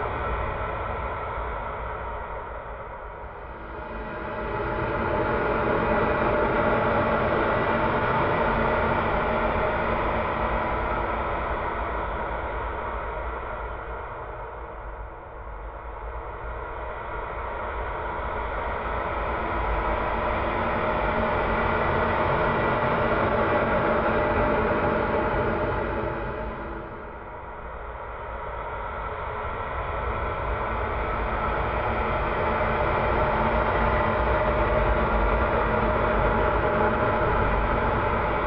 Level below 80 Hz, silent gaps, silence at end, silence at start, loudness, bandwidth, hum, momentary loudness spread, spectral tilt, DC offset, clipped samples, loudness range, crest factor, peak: -34 dBFS; none; 0 s; 0 s; -26 LUFS; 5.6 kHz; none; 13 LU; -11 dB/octave; under 0.1%; under 0.1%; 11 LU; 16 dB; -10 dBFS